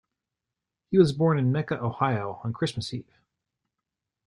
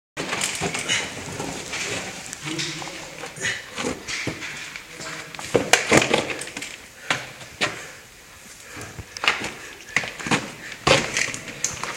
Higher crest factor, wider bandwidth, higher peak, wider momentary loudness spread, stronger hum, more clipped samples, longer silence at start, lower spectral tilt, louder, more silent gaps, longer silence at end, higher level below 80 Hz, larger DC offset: second, 20 dB vs 26 dB; second, 11 kHz vs 17 kHz; second, -8 dBFS vs 0 dBFS; second, 12 LU vs 18 LU; neither; neither; first, 0.9 s vs 0.15 s; first, -7.5 dB/octave vs -2.5 dB/octave; about the same, -26 LUFS vs -24 LUFS; neither; first, 1.25 s vs 0 s; second, -62 dBFS vs -52 dBFS; neither